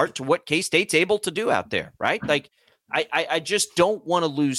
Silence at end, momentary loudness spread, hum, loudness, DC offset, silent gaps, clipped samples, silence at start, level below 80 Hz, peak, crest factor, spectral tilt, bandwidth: 0 s; 5 LU; none; -23 LUFS; under 0.1%; none; under 0.1%; 0 s; -62 dBFS; -6 dBFS; 18 dB; -3.5 dB/octave; 16 kHz